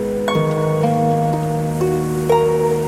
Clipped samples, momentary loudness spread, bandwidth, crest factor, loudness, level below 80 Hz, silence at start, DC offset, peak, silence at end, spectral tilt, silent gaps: under 0.1%; 4 LU; 15.5 kHz; 14 dB; -18 LUFS; -42 dBFS; 0 s; under 0.1%; -2 dBFS; 0 s; -7 dB/octave; none